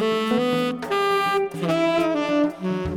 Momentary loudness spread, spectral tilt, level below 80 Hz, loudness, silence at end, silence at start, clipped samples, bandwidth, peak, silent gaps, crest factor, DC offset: 4 LU; -5.5 dB/octave; -50 dBFS; -22 LUFS; 0 s; 0 s; under 0.1%; 19 kHz; -10 dBFS; none; 12 dB; under 0.1%